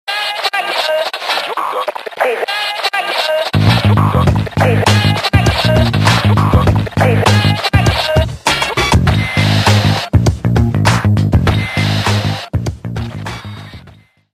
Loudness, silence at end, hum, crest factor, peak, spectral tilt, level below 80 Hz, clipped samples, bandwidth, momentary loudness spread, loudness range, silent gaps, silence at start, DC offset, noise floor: -13 LUFS; 0.45 s; none; 12 dB; 0 dBFS; -5.5 dB/octave; -26 dBFS; under 0.1%; 14.5 kHz; 9 LU; 4 LU; none; 0.05 s; under 0.1%; -42 dBFS